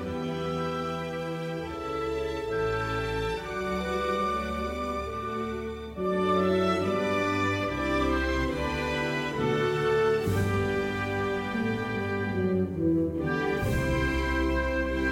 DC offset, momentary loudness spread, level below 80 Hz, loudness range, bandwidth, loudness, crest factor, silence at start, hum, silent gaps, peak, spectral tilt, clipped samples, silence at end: under 0.1%; 7 LU; -40 dBFS; 4 LU; 17 kHz; -29 LUFS; 14 dB; 0 s; none; none; -14 dBFS; -6.5 dB/octave; under 0.1%; 0 s